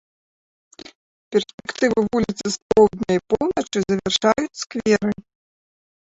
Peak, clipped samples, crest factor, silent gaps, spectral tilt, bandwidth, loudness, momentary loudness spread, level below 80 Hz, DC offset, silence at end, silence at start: -4 dBFS; under 0.1%; 18 dB; 1.54-1.58 s, 2.62-2.69 s; -4.5 dB/octave; 8 kHz; -21 LUFS; 10 LU; -52 dBFS; under 0.1%; 1 s; 1.3 s